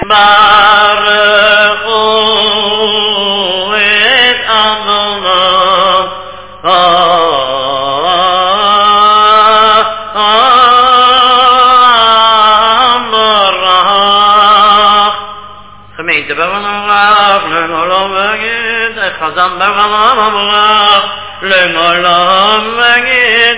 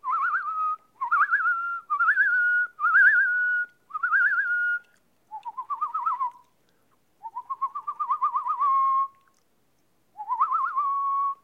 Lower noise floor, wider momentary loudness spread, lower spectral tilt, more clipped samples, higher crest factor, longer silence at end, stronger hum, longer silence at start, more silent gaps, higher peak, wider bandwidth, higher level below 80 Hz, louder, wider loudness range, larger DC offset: second, -32 dBFS vs -70 dBFS; second, 8 LU vs 13 LU; first, -6 dB/octave vs -1 dB/octave; first, 2% vs under 0.1%; second, 8 dB vs 16 dB; about the same, 0 s vs 0.1 s; neither; about the same, 0 s vs 0.05 s; neither; first, 0 dBFS vs -10 dBFS; second, 4 kHz vs 6.6 kHz; first, -44 dBFS vs -82 dBFS; first, -7 LUFS vs -24 LUFS; second, 5 LU vs 9 LU; first, 1% vs under 0.1%